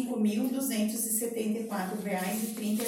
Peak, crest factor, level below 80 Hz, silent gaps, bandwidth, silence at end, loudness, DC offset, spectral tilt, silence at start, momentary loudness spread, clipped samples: -16 dBFS; 16 dB; -78 dBFS; none; 17 kHz; 0 s; -31 LUFS; under 0.1%; -4.5 dB/octave; 0 s; 4 LU; under 0.1%